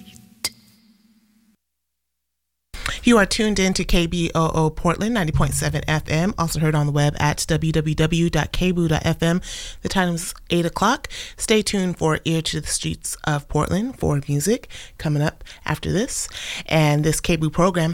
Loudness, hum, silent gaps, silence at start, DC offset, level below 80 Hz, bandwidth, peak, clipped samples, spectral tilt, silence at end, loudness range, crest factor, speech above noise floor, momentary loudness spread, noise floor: -21 LUFS; none; none; 0.05 s; under 0.1%; -34 dBFS; 16.5 kHz; -6 dBFS; under 0.1%; -5 dB/octave; 0 s; 3 LU; 16 dB; 59 dB; 9 LU; -79 dBFS